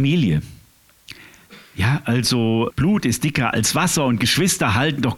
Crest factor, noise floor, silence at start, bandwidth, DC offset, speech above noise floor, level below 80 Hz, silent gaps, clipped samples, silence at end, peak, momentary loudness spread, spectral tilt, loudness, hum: 16 dB; -53 dBFS; 0 s; 18 kHz; under 0.1%; 34 dB; -44 dBFS; none; under 0.1%; 0 s; -4 dBFS; 5 LU; -4.5 dB/octave; -19 LUFS; none